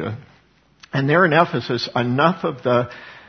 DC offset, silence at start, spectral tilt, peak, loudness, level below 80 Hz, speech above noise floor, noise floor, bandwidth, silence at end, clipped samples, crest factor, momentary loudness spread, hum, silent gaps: under 0.1%; 0 s; -7 dB/octave; 0 dBFS; -19 LUFS; -60 dBFS; 37 dB; -56 dBFS; 6.6 kHz; 0.1 s; under 0.1%; 20 dB; 14 LU; none; none